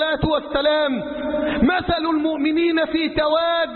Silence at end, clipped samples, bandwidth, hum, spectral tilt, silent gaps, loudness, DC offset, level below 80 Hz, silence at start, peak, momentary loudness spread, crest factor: 0 s; under 0.1%; 4.4 kHz; none; -10.5 dB/octave; none; -20 LUFS; under 0.1%; -40 dBFS; 0 s; -6 dBFS; 4 LU; 14 dB